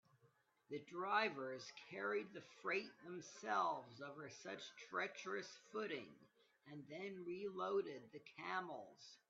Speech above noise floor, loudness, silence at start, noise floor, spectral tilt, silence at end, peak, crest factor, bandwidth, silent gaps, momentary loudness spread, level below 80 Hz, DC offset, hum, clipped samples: 31 dB; -47 LUFS; 0.25 s; -78 dBFS; -2 dB/octave; 0.15 s; -26 dBFS; 22 dB; 7.4 kHz; none; 14 LU; under -90 dBFS; under 0.1%; none; under 0.1%